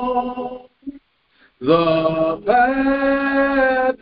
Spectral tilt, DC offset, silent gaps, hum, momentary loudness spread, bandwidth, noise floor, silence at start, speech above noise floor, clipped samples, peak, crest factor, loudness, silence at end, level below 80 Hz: -10.5 dB/octave; under 0.1%; none; none; 18 LU; 5.2 kHz; -57 dBFS; 0 s; 41 dB; under 0.1%; -2 dBFS; 16 dB; -17 LUFS; 0.05 s; -46 dBFS